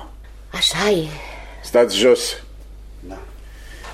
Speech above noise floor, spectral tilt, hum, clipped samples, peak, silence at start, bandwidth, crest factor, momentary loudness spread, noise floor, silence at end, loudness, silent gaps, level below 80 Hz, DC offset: 20 dB; -3 dB/octave; none; under 0.1%; -4 dBFS; 0 s; 16 kHz; 18 dB; 23 LU; -38 dBFS; 0 s; -17 LUFS; none; -38 dBFS; under 0.1%